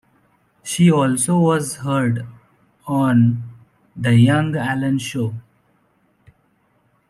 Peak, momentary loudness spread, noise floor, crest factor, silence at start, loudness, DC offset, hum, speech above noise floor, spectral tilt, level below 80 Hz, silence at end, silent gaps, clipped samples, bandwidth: -4 dBFS; 17 LU; -62 dBFS; 16 dB; 0.65 s; -18 LUFS; under 0.1%; none; 45 dB; -6 dB/octave; -58 dBFS; 1.7 s; none; under 0.1%; 13.5 kHz